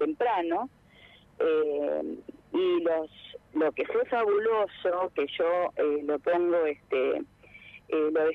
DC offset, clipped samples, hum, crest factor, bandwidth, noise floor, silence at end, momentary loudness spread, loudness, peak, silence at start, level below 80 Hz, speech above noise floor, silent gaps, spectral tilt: under 0.1%; under 0.1%; 50 Hz at -65 dBFS; 12 dB; 4.5 kHz; -56 dBFS; 0 s; 12 LU; -28 LUFS; -16 dBFS; 0 s; -68 dBFS; 28 dB; none; -6.5 dB/octave